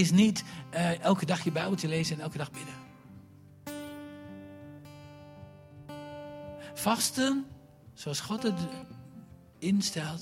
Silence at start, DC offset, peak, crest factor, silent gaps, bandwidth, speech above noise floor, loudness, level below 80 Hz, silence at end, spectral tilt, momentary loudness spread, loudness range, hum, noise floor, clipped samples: 0 s; under 0.1%; -10 dBFS; 22 dB; none; 16.5 kHz; 24 dB; -31 LUFS; -66 dBFS; 0 s; -4.5 dB/octave; 23 LU; 14 LU; none; -53 dBFS; under 0.1%